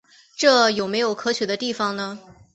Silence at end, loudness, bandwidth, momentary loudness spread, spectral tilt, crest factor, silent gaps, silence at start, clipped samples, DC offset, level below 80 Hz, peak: 0.35 s; -21 LUFS; 8.2 kHz; 16 LU; -3 dB/octave; 20 dB; none; 0.4 s; under 0.1%; under 0.1%; -64 dBFS; -4 dBFS